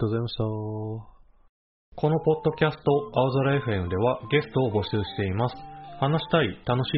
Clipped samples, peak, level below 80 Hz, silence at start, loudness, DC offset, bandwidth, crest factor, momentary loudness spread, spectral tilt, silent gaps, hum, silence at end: under 0.1%; -8 dBFS; -52 dBFS; 0 s; -26 LUFS; under 0.1%; 5.6 kHz; 18 dB; 9 LU; -5.5 dB/octave; 1.49-1.92 s; none; 0 s